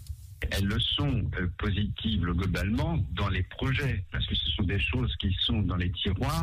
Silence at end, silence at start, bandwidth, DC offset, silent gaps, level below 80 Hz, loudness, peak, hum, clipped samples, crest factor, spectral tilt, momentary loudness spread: 0 s; 0 s; 15.5 kHz; under 0.1%; none; -36 dBFS; -29 LUFS; -16 dBFS; none; under 0.1%; 12 dB; -6 dB/octave; 4 LU